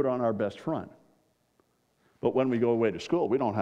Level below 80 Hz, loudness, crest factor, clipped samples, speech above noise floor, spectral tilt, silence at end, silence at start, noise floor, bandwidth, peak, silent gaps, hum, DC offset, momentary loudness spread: -70 dBFS; -29 LUFS; 16 dB; under 0.1%; 43 dB; -7.5 dB/octave; 0 s; 0 s; -70 dBFS; 8.6 kHz; -12 dBFS; none; none; under 0.1%; 8 LU